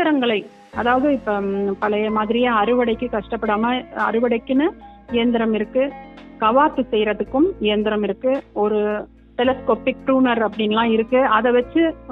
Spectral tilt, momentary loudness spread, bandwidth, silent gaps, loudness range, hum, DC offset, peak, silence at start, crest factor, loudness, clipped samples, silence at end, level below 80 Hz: -8 dB/octave; 7 LU; 4.9 kHz; none; 2 LU; none; under 0.1%; -2 dBFS; 0 s; 16 dB; -19 LUFS; under 0.1%; 0 s; -48 dBFS